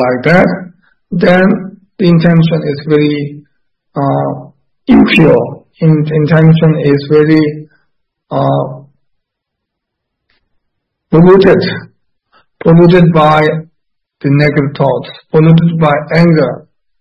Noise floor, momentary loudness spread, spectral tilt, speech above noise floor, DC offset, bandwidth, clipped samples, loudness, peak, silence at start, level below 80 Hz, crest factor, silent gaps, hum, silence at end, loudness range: -74 dBFS; 14 LU; -9 dB/octave; 67 dB; under 0.1%; 5.8 kHz; 0.7%; -9 LUFS; 0 dBFS; 0 s; -42 dBFS; 10 dB; none; none; 0.4 s; 6 LU